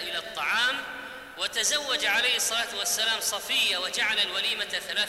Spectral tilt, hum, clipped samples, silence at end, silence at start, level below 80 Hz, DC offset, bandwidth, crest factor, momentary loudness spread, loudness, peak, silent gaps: 1.5 dB/octave; none; under 0.1%; 0 s; 0 s; -64 dBFS; under 0.1%; 16 kHz; 16 dB; 9 LU; -25 LUFS; -12 dBFS; none